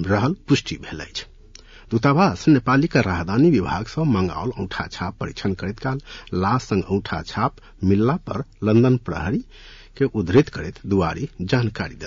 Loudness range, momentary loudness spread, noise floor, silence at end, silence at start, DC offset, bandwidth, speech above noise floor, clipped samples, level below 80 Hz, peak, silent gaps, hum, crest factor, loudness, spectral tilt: 5 LU; 12 LU; -45 dBFS; 0 s; 0 s; under 0.1%; 7.6 kHz; 24 dB; under 0.1%; -44 dBFS; -4 dBFS; none; none; 16 dB; -21 LUFS; -7 dB/octave